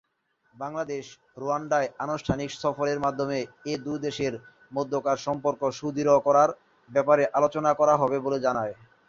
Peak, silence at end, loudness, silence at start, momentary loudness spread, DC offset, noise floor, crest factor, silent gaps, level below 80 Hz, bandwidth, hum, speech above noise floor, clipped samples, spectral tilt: -6 dBFS; 0.35 s; -26 LUFS; 0.6 s; 13 LU; under 0.1%; -71 dBFS; 20 dB; none; -58 dBFS; 7.6 kHz; none; 45 dB; under 0.1%; -5.5 dB/octave